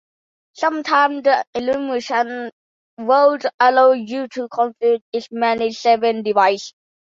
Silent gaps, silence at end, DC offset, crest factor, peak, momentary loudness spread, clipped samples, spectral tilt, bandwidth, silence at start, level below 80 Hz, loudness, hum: 1.47-1.53 s, 2.52-2.97 s, 3.54-3.58 s, 5.02-5.12 s; 0.5 s; under 0.1%; 18 dB; 0 dBFS; 11 LU; under 0.1%; -4 dB/octave; 7.6 kHz; 0.6 s; -66 dBFS; -18 LUFS; none